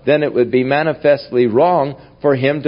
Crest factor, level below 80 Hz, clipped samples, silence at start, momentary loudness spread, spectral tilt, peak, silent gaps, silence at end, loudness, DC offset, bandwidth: 14 dB; -54 dBFS; under 0.1%; 0.05 s; 5 LU; -12 dB/octave; 0 dBFS; none; 0 s; -15 LUFS; under 0.1%; 5.4 kHz